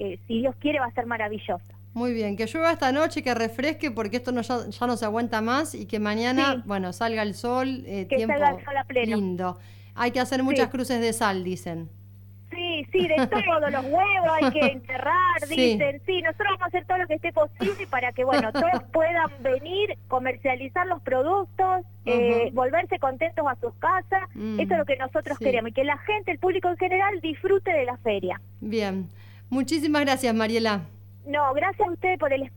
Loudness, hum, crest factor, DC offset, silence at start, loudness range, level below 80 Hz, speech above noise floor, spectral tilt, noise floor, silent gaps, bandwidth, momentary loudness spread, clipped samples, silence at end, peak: -25 LUFS; 50 Hz at -45 dBFS; 16 dB; under 0.1%; 0 s; 4 LU; -58 dBFS; 21 dB; -5 dB/octave; -46 dBFS; none; 19 kHz; 8 LU; under 0.1%; 0 s; -10 dBFS